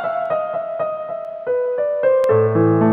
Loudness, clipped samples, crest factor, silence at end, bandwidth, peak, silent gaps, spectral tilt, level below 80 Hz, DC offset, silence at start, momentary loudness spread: -19 LUFS; under 0.1%; 14 dB; 0 s; 5.6 kHz; -4 dBFS; none; -10 dB/octave; -60 dBFS; under 0.1%; 0 s; 10 LU